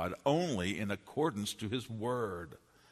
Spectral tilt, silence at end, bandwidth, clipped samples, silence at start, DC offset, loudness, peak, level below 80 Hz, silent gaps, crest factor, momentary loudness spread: -5 dB/octave; 0.35 s; 13.5 kHz; under 0.1%; 0 s; under 0.1%; -36 LUFS; -16 dBFS; -66 dBFS; none; 20 dB; 7 LU